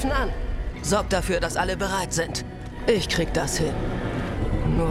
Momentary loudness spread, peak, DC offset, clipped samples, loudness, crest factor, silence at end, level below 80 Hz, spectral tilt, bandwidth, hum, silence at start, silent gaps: 7 LU; -6 dBFS; under 0.1%; under 0.1%; -25 LUFS; 18 dB; 0 s; -32 dBFS; -4.5 dB/octave; 16 kHz; none; 0 s; none